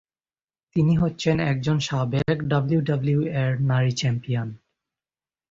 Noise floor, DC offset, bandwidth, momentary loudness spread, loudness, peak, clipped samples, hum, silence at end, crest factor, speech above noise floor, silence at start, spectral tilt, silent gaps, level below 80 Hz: under -90 dBFS; under 0.1%; 7.6 kHz; 5 LU; -23 LUFS; -8 dBFS; under 0.1%; none; 0.95 s; 16 dB; over 68 dB; 0.75 s; -6.5 dB/octave; none; -50 dBFS